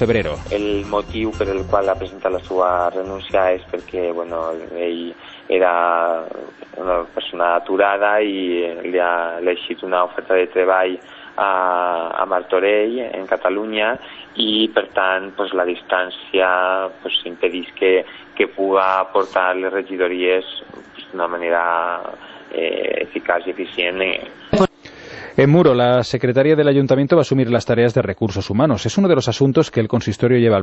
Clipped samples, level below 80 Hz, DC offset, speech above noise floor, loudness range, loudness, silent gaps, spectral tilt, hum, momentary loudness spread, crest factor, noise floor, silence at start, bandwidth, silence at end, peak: under 0.1%; -46 dBFS; under 0.1%; 20 dB; 5 LU; -18 LUFS; none; -6 dB/octave; none; 10 LU; 16 dB; -38 dBFS; 0 s; 8.2 kHz; 0 s; -2 dBFS